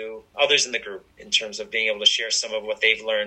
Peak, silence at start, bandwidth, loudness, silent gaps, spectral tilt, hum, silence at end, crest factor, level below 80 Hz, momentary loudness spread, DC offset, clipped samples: -4 dBFS; 0 s; 11.5 kHz; -21 LUFS; none; 1 dB/octave; none; 0 s; 20 dB; -64 dBFS; 12 LU; under 0.1%; under 0.1%